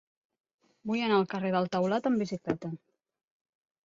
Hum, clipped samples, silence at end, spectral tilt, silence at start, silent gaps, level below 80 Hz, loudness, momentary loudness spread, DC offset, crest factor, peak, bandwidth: none; under 0.1%; 1.1 s; -7 dB/octave; 0.85 s; none; -70 dBFS; -30 LUFS; 13 LU; under 0.1%; 18 dB; -14 dBFS; 7.6 kHz